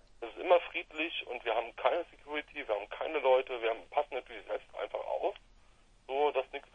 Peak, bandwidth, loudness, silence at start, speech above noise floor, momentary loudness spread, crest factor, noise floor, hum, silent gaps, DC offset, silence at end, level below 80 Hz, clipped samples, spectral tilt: -14 dBFS; 7.4 kHz; -34 LUFS; 0.2 s; 28 dB; 11 LU; 22 dB; -62 dBFS; none; none; under 0.1%; 0.15 s; -64 dBFS; under 0.1%; -4 dB/octave